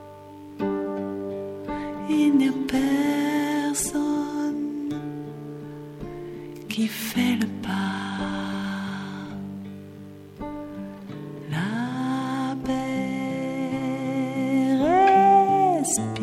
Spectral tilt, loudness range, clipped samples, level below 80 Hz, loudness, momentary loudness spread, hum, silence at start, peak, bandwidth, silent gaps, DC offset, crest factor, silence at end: -5 dB/octave; 10 LU; under 0.1%; -54 dBFS; -24 LUFS; 17 LU; none; 0 s; -8 dBFS; 16.5 kHz; none; under 0.1%; 18 dB; 0 s